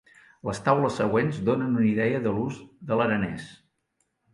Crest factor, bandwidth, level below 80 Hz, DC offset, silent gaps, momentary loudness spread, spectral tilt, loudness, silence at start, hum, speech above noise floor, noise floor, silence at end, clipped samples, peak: 20 dB; 11.5 kHz; -58 dBFS; under 0.1%; none; 12 LU; -7 dB/octave; -25 LUFS; 0.45 s; none; 50 dB; -75 dBFS; 0.8 s; under 0.1%; -6 dBFS